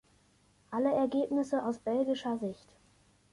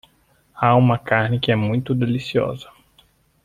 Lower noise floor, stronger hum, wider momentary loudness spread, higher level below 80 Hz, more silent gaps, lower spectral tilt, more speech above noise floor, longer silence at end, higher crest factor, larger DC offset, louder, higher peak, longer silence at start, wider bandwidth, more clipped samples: first, -67 dBFS vs -59 dBFS; first, 50 Hz at -65 dBFS vs none; first, 10 LU vs 7 LU; second, -72 dBFS vs -52 dBFS; neither; second, -6 dB/octave vs -8 dB/octave; second, 36 dB vs 41 dB; about the same, 0.8 s vs 0.8 s; about the same, 16 dB vs 20 dB; neither; second, -32 LUFS vs -19 LUFS; second, -18 dBFS vs -2 dBFS; first, 0.7 s vs 0.55 s; first, 11.5 kHz vs 7.4 kHz; neither